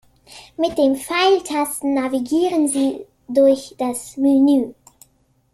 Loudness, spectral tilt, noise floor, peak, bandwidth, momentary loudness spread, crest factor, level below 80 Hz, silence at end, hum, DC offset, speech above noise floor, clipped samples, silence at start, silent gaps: -18 LUFS; -3 dB/octave; -61 dBFS; -4 dBFS; 14 kHz; 9 LU; 14 dB; -58 dBFS; 0.8 s; none; under 0.1%; 43 dB; under 0.1%; 0.3 s; none